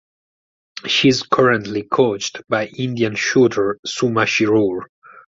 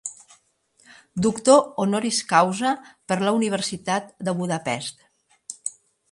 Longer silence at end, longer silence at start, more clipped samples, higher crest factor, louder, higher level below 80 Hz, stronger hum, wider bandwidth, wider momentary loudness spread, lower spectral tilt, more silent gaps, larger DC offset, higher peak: second, 0.2 s vs 0.4 s; first, 0.75 s vs 0.05 s; neither; second, 16 dB vs 22 dB; first, -17 LUFS vs -23 LUFS; first, -56 dBFS vs -64 dBFS; neither; second, 7.8 kHz vs 11.5 kHz; second, 8 LU vs 17 LU; about the same, -4.5 dB/octave vs -4 dB/octave; first, 3.79-3.83 s, 4.89-5.02 s vs none; neither; about the same, -2 dBFS vs -2 dBFS